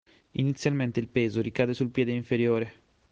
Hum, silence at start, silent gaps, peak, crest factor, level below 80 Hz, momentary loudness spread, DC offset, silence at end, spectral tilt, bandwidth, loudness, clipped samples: none; 0.4 s; none; -10 dBFS; 18 dB; -62 dBFS; 4 LU; under 0.1%; 0.4 s; -7 dB/octave; 8 kHz; -28 LUFS; under 0.1%